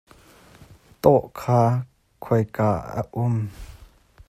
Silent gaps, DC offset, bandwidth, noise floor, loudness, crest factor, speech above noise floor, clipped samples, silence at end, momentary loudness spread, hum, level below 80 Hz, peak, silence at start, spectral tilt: none; under 0.1%; 14.5 kHz; -51 dBFS; -22 LUFS; 22 dB; 30 dB; under 0.1%; 0.45 s; 17 LU; none; -50 dBFS; -2 dBFS; 0.6 s; -8.5 dB/octave